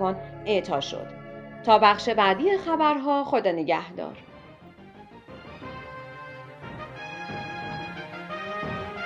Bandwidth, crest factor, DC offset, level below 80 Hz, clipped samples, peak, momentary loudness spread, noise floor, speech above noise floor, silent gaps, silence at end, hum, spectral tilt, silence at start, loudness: 9.4 kHz; 24 dB; under 0.1%; -58 dBFS; under 0.1%; -4 dBFS; 20 LU; -48 dBFS; 25 dB; none; 0 s; none; -5.5 dB/octave; 0 s; -25 LUFS